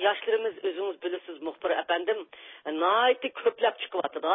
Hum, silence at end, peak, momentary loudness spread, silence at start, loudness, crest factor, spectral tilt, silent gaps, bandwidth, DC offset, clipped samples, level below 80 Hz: none; 0 s; -10 dBFS; 12 LU; 0 s; -28 LUFS; 18 dB; -6.5 dB/octave; none; 3.9 kHz; under 0.1%; under 0.1%; -80 dBFS